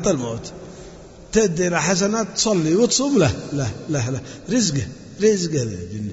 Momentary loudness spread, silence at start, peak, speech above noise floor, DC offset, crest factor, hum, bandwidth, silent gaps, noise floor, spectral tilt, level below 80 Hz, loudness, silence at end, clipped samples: 16 LU; 0 s; -4 dBFS; 20 dB; under 0.1%; 16 dB; none; 8 kHz; none; -41 dBFS; -4.5 dB/octave; -46 dBFS; -20 LUFS; 0 s; under 0.1%